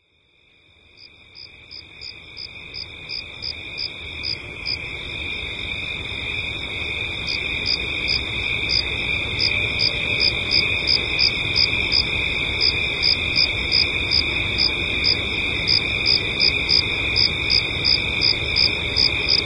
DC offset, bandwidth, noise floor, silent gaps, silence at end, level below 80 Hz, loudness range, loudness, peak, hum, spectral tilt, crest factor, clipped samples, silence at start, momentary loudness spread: under 0.1%; 11.5 kHz; -59 dBFS; none; 0 s; -38 dBFS; 12 LU; -19 LUFS; -6 dBFS; none; -3 dB/octave; 18 dB; under 0.1%; 1 s; 12 LU